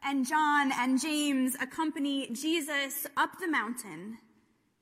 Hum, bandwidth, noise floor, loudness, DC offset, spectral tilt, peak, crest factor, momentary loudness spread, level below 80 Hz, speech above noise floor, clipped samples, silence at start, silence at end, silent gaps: none; 16 kHz; -69 dBFS; -30 LUFS; under 0.1%; -2 dB/octave; -16 dBFS; 16 dB; 11 LU; -80 dBFS; 38 dB; under 0.1%; 0 s; 0.65 s; none